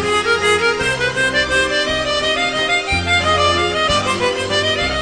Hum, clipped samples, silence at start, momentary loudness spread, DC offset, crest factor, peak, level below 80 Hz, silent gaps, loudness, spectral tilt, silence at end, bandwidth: none; under 0.1%; 0 s; 3 LU; 0.2%; 14 dB; -4 dBFS; -36 dBFS; none; -15 LUFS; -3 dB/octave; 0 s; 10 kHz